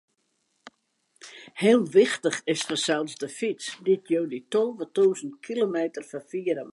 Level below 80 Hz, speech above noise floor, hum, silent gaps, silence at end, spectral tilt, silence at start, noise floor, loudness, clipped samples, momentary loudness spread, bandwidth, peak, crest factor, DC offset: -80 dBFS; 48 dB; none; none; 0 s; -4 dB/octave; 1.25 s; -73 dBFS; -26 LUFS; under 0.1%; 13 LU; 11.5 kHz; -8 dBFS; 18 dB; under 0.1%